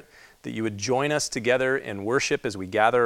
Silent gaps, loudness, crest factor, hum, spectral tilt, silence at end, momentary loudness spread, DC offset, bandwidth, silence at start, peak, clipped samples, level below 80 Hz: none; -25 LUFS; 20 dB; none; -4 dB/octave; 0 s; 8 LU; under 0.1%; 15.5 kHz; 0.45 s; -6 dBFS; under 0.1%; -60 dBFS